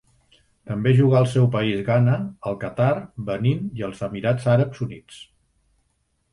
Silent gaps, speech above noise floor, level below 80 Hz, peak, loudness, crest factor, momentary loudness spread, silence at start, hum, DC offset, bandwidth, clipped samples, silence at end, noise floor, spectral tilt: none; 49 dB; -54 dBFS; -6 dBFS; -22 LUFS; 16 dB; 12 LU; 0.65 s; none; under 0.1%; 11 kHz; under 0.1%; 1.1 s; -69 dBFS; -8 dB/octave